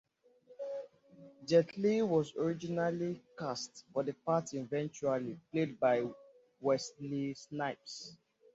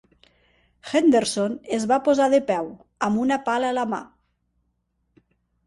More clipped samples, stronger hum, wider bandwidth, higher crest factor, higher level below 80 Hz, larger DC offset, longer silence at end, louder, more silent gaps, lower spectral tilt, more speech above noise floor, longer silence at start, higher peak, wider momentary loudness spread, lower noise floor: neither; second, none vs 60 Hz at -65 dBFS; second, 8 kHz vs 11.5 kHz; about the same, 20 dB vs 16 dB; second, -76 dBFS vs -64 dBFS; neither; second, 0.4 s vs 1.6 s; second, -35 LUFS vs -22 LUFS; neither; about the same, -5.5 dB/octave vs -4.5 dB/octave; second, 29 dB vs 51 dB; second, 0.5 s vs 0.85 s; second, -16 dBFS vs -8 dBFS; first, 14 LU vs 10 LU; second, -64 dBFS vs -72 dBFS